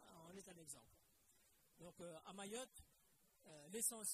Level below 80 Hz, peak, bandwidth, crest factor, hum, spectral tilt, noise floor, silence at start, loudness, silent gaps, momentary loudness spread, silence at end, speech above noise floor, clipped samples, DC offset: -82 dBFS; -28 dBFS; 15 kHz; 26 dB; none; -2 dB/octave; -78 dBFS; 0 s; -51 LUFS; none; 20 LU; 0 s; 26 dB; under 0.1%; under 0.1%